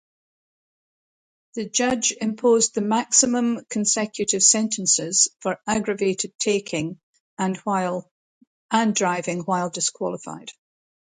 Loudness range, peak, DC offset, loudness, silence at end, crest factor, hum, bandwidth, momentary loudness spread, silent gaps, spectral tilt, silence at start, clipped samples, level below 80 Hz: 6 LU; -2 dBFS; under 0.1%; -21 LUFS; 0.7 s; 22 dB; none; 9.6 kHz; 12 LU; 6.35-6.39 s, 7.03-7.14 s, 7.20-7.37 s, 8.11-8.41 s, 8.47-8.69 s; -2.5 dB/octave; 1.55 s; under 0.1%; -64 dBFS